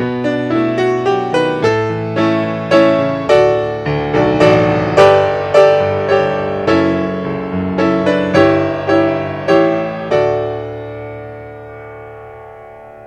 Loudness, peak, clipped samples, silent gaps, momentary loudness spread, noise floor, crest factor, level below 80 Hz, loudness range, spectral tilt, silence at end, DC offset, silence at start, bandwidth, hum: -13 LUFS; 0 dBFS; under 0.1%; none; 18 LU; -35 dBFS; 14 dB; -44 dBFS; 6 LU; -7 dB/octave; 0 s; under 0.1%; 0 s; 9.8 kHz; none